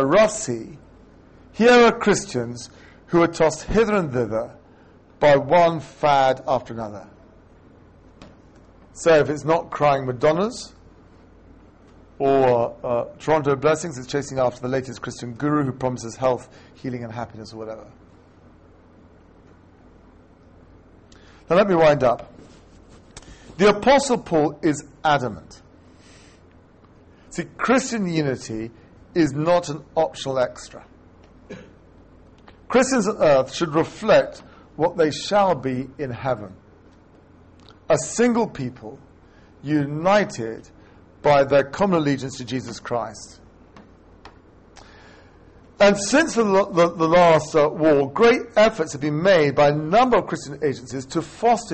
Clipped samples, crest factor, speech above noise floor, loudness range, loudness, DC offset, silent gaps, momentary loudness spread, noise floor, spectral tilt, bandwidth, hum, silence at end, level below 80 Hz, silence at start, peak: under 0.1%; 18 dB; 31 dB; 9 LU; -20 LUFS; under 0.1%; none; 16 LU; -51 dBFS; -5 dB/octave; 8.8 kHz; none; 0 s; -50 dBFS; 0 s; -2 dBFS